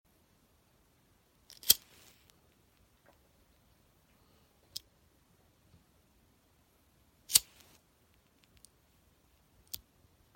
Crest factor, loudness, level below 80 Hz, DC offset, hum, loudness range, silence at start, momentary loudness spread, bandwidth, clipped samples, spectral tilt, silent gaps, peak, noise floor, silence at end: 42 dB; -31 LUFS; -70 dBFS; under 0.1%; none; 20 LU; 1.65 s; 22 LU; 16.5 kHz; under 0.1%; 1.5 dB/octave; none; 0 dBFS; -69 dBFS; 2.95 s